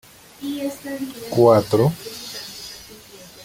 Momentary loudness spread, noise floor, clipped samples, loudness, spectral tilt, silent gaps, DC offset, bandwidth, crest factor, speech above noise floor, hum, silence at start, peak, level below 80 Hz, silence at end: 24 LU; -43 dBFS; under 0.1%; -21 LUFS; -6 dB/octave; none; under 0.1%; 17 kHz; 20 dB; 24 dB; none; 0.4 s; -2 dBFS; -56 dBFS; 0 s